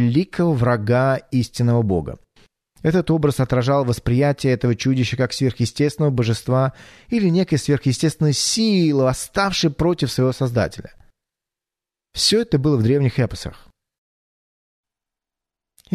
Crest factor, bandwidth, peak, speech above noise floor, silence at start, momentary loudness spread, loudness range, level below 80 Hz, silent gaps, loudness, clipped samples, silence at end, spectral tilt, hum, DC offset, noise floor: 16 dB; 13.5 kHz; -4 dBFS; 70 dB; 0 s; 6 LU; 3 LU; -44 dBFS; none; -19 LUFS; under 0.1%; 2.4 s; -5.5 dB/octave; none; under 0.1%; -88 dBFS